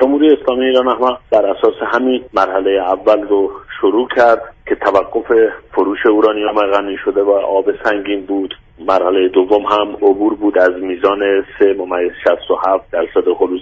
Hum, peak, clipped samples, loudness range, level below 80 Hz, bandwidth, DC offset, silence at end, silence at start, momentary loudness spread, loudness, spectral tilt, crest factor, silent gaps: none; 0 dBFS; under 0.1%; 1 LU; -48 dBFS; 7 kHz; under 0.1%; 0 s; 0 s; 6 LU; -14 LUFS; -5.5 dB/octave; 14 dB; none